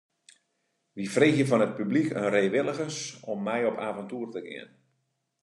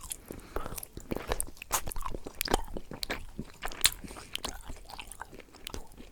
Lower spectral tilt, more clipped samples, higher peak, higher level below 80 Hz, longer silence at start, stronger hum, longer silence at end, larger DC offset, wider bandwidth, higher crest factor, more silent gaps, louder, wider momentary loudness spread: first, -5.5 dB/octave vs -2 dB/octave; neither; second, -8 dBFS vs -2 dBFS; second, -76 dBFS vs -44 dBFS; first, 0.95 s vs 0 s; neither; first, 0.8 s vs 0 s; neither; second, 11.5 kHz vs over 20 kHz; second, 22 dB vs 34 dB; neither; first, -27 LUFS vs -35 LUFS; second, 15 LU vs 18 LU